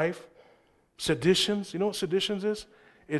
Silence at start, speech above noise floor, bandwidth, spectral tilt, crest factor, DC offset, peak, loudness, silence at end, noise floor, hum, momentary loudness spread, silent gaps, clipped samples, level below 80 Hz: 0 s; 35 dB; 12.5 kHz; -4.5 dB/octave; 20 dB; under 0.1%; -10 dBFS; -28 LUFS; 0 s; -64 dBFS; none; 11 LU; none; under 0.1%; -60 dBFS